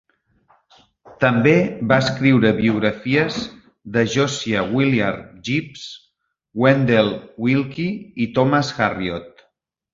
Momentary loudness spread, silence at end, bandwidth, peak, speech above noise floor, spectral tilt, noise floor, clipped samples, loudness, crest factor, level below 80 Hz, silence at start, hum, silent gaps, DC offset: 12 LU; 0.65 s; 7.6 kHz; 0 dBFS; 48 dB; -6 dB/octave; -66 dBFS; under 0.1%; -19 LUFS; 20 dB; -52 dBFS; 1.2 s; none; none; under 0.1%